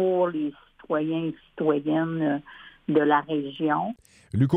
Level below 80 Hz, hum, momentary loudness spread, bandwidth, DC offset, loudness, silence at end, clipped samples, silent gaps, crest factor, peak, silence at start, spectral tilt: -62 dBFS; none; 11 LU; 8.8 kHz; under 0.1%; -26 LUFS; 0 s; under 0.1%; none; 18 dB; -8 dBFS; 0 s; -9 dB/octave